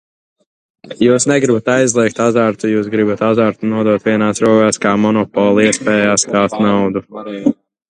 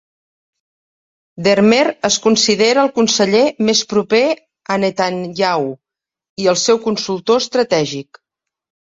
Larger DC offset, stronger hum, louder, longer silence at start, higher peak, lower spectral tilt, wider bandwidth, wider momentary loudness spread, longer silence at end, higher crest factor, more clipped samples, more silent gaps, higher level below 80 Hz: neither; neither; about the same, -13 LUFS vs -15 LUFS; second, 0.85 s vs 1.35 s; about the same, 0 dBFS vs 0 dBFS; about the same, -4.5 dB/octave vs -3.5 dB/octave; first, 10.5 kHz vs 7.8 kHz; about the same, 7 LU vs 8 LU; second, 0.35 s vs 0.9 s; about the same, 14 dB vs 16 dB; neither; second, none vs 6.29-6.36 s; first, -52 dBFS vs -58 dBFS